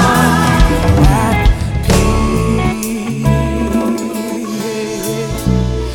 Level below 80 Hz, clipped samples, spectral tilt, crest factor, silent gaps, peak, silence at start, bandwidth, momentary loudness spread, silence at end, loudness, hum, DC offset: -18 dBFS; under 0.1%; -5.5 dB/octave; 12 dB; none; 0 dBFS; 0 s; 18 kHz; 9 LU; 0 s; -14 LUFS; none; under 0.1%